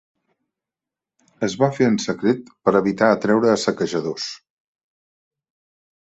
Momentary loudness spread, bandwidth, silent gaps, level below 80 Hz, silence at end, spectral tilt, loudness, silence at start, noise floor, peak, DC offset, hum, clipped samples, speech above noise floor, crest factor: 10 LU; 8.2 kHz; none; -62 dBFS; 1.7 s; -5.5 dB/octave; -20 LUFS; 1.4 s; -88 dBFS; -2 dBFS; under 0.1%; none; under 0.1%; 69 dB; 20 dB